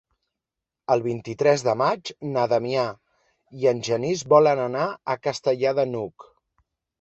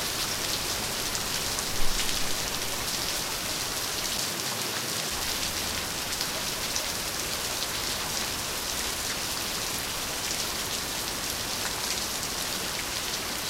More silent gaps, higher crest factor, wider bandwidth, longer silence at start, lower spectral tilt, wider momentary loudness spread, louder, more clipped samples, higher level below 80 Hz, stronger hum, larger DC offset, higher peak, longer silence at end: neither; about the same, 20 dB vs 22 dB; second, 8.2 kHz vs 16.5 kHz; first, 0.9 s vs 0 s; first, -5.5 dB/octave vs -1 dB/octave; first, 11 LU vs 2 LU; first, -23 LUFS vs -28 LUFS; neither; second, -66 dBFS vs -42 dBFS; neither; neither; first, -4 dBFS vs -8 dBFS; first, 0.8 s vs 0 s